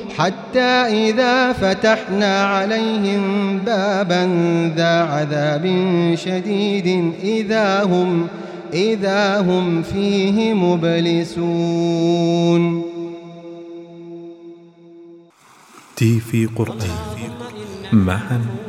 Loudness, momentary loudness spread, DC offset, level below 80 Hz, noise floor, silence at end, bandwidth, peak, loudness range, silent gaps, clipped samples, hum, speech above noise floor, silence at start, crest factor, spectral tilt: -18 LUFS; 15 LU; under 0.1%; -50 dBFS; -48 dBFS; 0 s; 13.5 kHz; -2 dBFS; 7 LU; none; under 0.1%; none; 31 dB; 0 s; 16 dB; -6 dB/octave